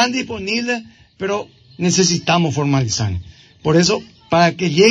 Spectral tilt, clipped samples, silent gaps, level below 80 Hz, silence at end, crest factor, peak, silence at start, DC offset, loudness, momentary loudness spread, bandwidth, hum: -4.5 dB/octave; under 0.1%; none; -48 dBFS; 0 s; 16 dB; -2 dBFS; 0 s; under 0.1%; -17 LUFS; 10 LU; 9.8 kHz; none